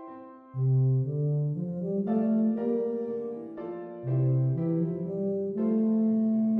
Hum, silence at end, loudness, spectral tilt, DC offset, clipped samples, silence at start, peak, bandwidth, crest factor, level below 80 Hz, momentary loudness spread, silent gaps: none; 0 s; -28 LUFS; -13.5 dB/octave; under 0.1%; under 0.1%; 0 s; -16 dBFS; 2.8 kHz; 12 dB; -68 dBFS; 13 LU; none